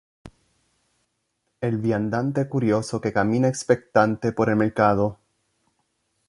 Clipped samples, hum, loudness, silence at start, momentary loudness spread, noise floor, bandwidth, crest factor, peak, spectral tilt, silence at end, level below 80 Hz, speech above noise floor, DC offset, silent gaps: under 0.1%; none; -22 LUFS; 0.25 s; 5 LU; -75 dBFS; 11.5 kHz; 22 dB; -2 dBFS; -7 dB/octave; 1.15 s; -56 dBFS; 53 dB; under 0.1%; none